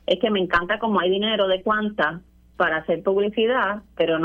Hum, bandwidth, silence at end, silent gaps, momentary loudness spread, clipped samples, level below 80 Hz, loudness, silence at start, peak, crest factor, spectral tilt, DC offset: none; 7 kHz; 0 s; none; 4 LU; under 0.1%; -52 dBFS; -22 LUFS; 0.1 s; -6 dBFS; 16 dB; -7 dB/octave; under 0.1%